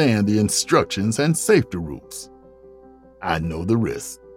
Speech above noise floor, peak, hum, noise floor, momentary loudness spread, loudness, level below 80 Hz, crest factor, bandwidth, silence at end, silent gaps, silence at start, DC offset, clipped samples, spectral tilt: 27 dB; -4 dBFS; none; -47 dBFS; 16 LU; -20 LUFS; -46 dBFS; 18 dB; 18 kHz; 0 s; none; 0 s; under 0.1%; under 0.1%; -5 dB/octave